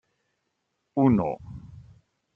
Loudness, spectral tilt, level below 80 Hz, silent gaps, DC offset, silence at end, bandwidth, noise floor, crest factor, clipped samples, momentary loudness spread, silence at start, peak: -24 LUFS; -11 dB/octave; -56 dBFS; none; under 0.1%; 0.55 s; 3.4 kHz; -78 dBFS; 20 dB; under 0.1%; 22 LU; 0.95 s; -8 dBFS